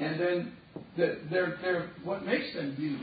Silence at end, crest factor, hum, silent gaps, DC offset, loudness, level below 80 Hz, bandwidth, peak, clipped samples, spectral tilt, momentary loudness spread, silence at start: 0 s; 18 dB; none; none; under 0.1%; -32 LUFS; -68 dBFS; 4.9 kHz; -14 dBFS; under 0.1%; -4.5 dB/octave; 9 LU; 0 s